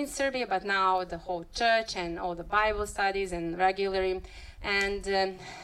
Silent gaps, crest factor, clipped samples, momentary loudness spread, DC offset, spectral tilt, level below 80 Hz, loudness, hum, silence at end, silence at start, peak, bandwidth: none; 16 dB; under 0.1%; 9 LU; under 0.1%; -3.5 dB/octave; -48 dBFS; -29 LUFS; none; 0 s; 0 s; -14 dBFS; 15 kHz